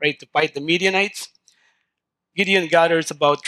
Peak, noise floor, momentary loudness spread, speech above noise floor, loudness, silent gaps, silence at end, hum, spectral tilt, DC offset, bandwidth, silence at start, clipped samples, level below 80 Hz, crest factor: -4 dBFS; -80 dBFS; 13 LU; 61 dB; -19 LUFS; none; 0 s; none; -3.5 dB/octave; under 0.1%; 14.5 kHz; 0 s; under 0.1%; -72 dBFS; 18 dB